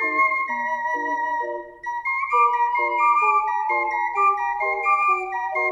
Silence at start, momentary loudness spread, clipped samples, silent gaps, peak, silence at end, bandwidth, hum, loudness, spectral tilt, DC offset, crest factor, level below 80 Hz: 0 s; 7 LU; under 0.1%; none; -8 dBFS; 0 s; 10 kHz; none; -21 LUFS; -3 dB/octave; under 0.1%; 14 dB; -62 dBFS